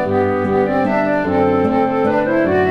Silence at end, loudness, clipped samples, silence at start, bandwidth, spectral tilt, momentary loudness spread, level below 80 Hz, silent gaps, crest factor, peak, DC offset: 0 s; -16 LUFS; under 0.1%; 0 s; 7.4 kHz; -8.5 dB/octave; 2 LU; -46 dBFS; none; 12 dB; -4 dBFS; under 0.1%